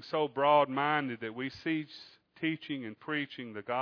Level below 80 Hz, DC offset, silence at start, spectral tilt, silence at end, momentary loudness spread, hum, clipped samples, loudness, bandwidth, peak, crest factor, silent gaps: -78 dBFS; under 0.1%; 0 s; -7 dB/octave; 0 s; 13 LU; none; under 0.1%; -32 LUFS; 5.4 kHz; -14 dBFS; 18 dB; none